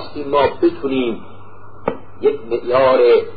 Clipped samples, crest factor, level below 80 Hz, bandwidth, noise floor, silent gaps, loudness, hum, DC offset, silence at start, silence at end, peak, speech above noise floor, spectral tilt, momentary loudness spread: under 0.1%; 14 dB; -48 dBFS; 5 kHz; -41 dBFS; none; -17 LUFS; none; 3%; 0 s; 0 s; -4 dBFS; 25 dB; -11 dB/octave; 14 LU